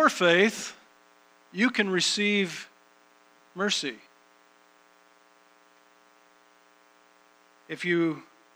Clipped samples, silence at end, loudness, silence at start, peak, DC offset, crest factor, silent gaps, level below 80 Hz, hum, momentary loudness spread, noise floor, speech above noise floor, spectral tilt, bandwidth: under 0.1%; 0.35 s; -25 LUFS; 0 s; -6 dBFS; under 0.1%; 24 dB; none; -86 dBFS; none; 20 LU; -60 dBFS; 34 dB; -3.5 dB/octave; over 20 kHz